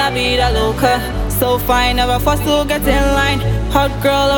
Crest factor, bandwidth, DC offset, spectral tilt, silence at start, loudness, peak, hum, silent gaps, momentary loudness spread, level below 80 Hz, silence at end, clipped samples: 14 dB; 17.5 kHz; under 0.1%; -4.5 dB/octave; 0 s; -15 LUFS; 0 dBFS; none; none; 3 LU; -22 dBFS; 0 s; under 0.1%